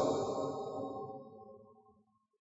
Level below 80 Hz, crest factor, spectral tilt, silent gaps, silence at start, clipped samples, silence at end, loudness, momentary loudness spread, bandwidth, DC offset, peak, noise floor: -74 dBFS; 20 dB; -6.5 dB/octave; none; 0 s; under 0.1%; 0.6 s; -40 LUFS; 21 LU; 7.6 kHz; under 0.1%; -20 dBFS; -72 dBFS